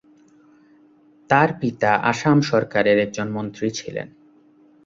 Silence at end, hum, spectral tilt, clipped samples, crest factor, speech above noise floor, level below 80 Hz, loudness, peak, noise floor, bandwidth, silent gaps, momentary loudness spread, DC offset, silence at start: 0.8 s; none; -6 dB/octave; under 0.1%; 20 dB; 34 dB; -60 dBFS; -20 LUFS; -2 dBFS; -53 dBFS; 7.8 kHz; none; 12 LU; under 0.1%; 1.3 s